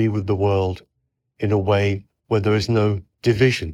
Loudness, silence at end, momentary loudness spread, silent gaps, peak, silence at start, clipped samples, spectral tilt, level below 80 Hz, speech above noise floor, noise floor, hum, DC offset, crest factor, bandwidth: -21 LUFS; 0 s; 8 LU; none; -4 dBFS; 0 s; under 0.1%; -7 dB/octave; -50 dBFS; 55 dB; -74 dBFS; none; under 0.1%; 16 dB; 11 kHz